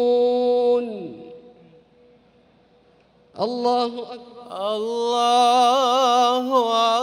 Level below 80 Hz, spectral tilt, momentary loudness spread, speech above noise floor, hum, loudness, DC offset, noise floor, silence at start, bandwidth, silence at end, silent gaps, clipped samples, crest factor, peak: -70 dBFS; -3 dB/octave; 18 LU; 37 dB; none; -20 LUFS; under 0.1%; -57 dBFS; 0 s; 15 kHz; 0 s; none; under 0.1%; 16 dB; -6 dBFS